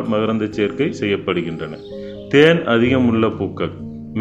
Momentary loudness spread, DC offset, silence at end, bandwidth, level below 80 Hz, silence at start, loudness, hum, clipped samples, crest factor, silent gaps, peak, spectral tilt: 17 LU; under 0.1%; 0 s; 8.2 kHz; -50 dBFS; 0 s; -18 LUFS; none; under 0.1%; 18 dB; none; 0 dBFS; -7 dB/octave